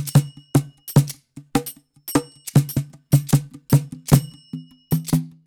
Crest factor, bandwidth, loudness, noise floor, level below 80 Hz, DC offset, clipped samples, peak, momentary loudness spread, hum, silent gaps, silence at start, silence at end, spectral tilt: 20 dB; 19 kHz; -21 LUFS; -38 dBFS; -44 dBFS; under 0.1%; under 0.1%; -2 dBFS; 17 LU; none; none; 0 s; 0.15 s; -6.5 dB/octave